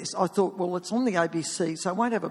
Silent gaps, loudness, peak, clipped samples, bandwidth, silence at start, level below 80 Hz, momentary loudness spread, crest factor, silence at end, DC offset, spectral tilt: none; -27 LUFS; -10 dBFS; under 0.1%; 12.5 kHz; 0 s; -72 dBFS; 3 LU; 18 dB; 0 s; under 0.1%; -4.5 dB/octave